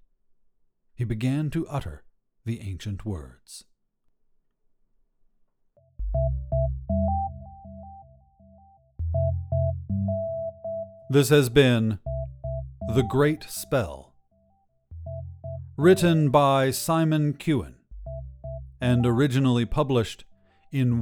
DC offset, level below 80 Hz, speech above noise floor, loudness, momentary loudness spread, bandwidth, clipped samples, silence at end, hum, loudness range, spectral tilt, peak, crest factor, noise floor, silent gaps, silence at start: under 0.1%; -40 dBFS; 45 dB; -25 LUFS; 20 LU; 19 kHz; under 0.1%; 0 s; none; 13 LU; -6.5 dB/octave; -6 dBFS; 20 dB; -68 dBFS; none; 1 s